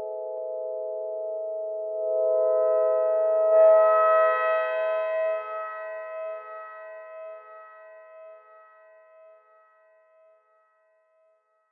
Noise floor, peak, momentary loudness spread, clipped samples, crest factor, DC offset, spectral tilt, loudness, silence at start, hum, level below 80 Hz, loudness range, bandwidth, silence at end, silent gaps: -67 dBFS; -10 dBFS; 23 LU; under 0.1%; 16 dB; under 0.1%; -4 dB/octave; -24 LUFS; 0 s; none; under -90 dBFS; 20 LU; 4.1 kHz; 3.35 s; none